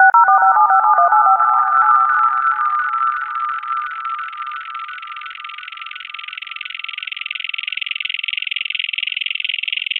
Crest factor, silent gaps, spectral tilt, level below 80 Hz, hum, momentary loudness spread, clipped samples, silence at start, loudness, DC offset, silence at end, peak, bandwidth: 16 dB; none; -1 dB/octave; -70 dBFS; none; 17 LU; under 0.1%; 0 s; -16 LUFS; under 0.1%; 0 s; 0 dBFS; 4.4 kHz